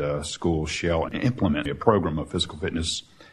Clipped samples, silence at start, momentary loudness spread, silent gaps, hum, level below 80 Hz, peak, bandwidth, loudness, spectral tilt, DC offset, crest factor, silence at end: under 0.1%; 0 s; 6 LU; none; none; -42 dBFS; -4 dBFS; 12 kHz; -25 LUFS; -5 dB/octave; under 0.1%; 20 dB; 0.05 s